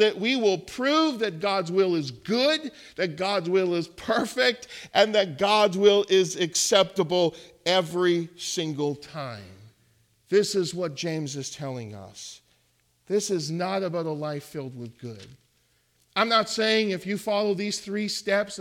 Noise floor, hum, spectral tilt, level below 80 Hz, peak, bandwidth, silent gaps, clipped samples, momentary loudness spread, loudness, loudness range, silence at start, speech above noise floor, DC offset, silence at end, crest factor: -67 dBFS; none; -3.5 dB/octave; -68 dBFS; -6 dBFS; 16 kHz; none; under 0.1%; 16 LU; -25 LUFS; 9 LU; 0 s; 42 dB; under 0.1%; 0 s; 20 dB